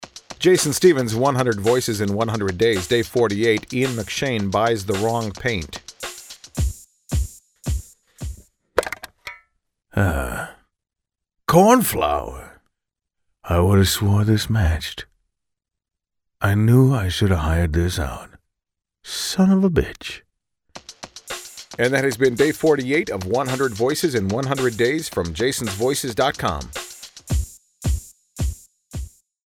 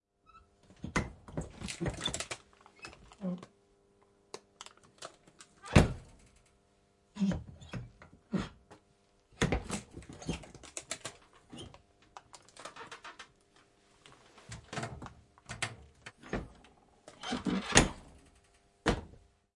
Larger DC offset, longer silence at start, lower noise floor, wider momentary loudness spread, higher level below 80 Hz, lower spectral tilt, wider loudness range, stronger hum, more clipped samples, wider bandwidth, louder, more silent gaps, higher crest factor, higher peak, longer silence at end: neither; second, 0 s vs 0.35 s; first, -83 dBFS vs -70 dBFS; second, 19 LU vs 24 LU; first, -34 dBFS vs -50 dBFS; first, -5.5 dB/octave vs -4 dB/octave; second, 9 LU vs 14 LU; neither; neither; first, 19 kHz vs 11.5 kHz; first, -20 LUFS vs -35 LUFS; neither; second, 20 dB vs 32 dB; first, -2 dBFS vs -6 dBFS; about the same, 0.4 s vs 0.4 s